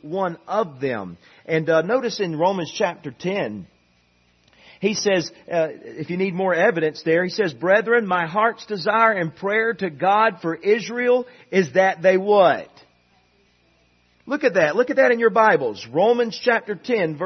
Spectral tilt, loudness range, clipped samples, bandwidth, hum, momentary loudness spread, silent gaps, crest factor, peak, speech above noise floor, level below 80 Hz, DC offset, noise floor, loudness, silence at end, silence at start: -5 dB/octave; 6 LU; under 0.1%; 6.4 kHz; none; 9 LU; none; 18 dB; -2 dBFS; 41 dB; -70 dBFS; under 0.1%; -61 dBFS; -20 LUFS; 0 s; 0.05 s